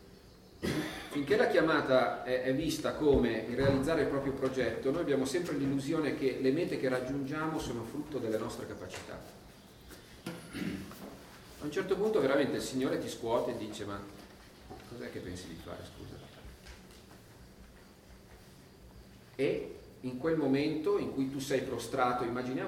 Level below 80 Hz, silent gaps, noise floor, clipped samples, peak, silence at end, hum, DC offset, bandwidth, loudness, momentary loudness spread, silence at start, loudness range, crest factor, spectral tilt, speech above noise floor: -56 dBFS; none; -56 dBFS; under 0.1%; -14 dBFS; 0 s; none; under 0.1%; 16.5 kHz; -33 LUFS; 22 LU; 0 s; 17 LU; 20 dB; -5.5 dB/octave; 23 dB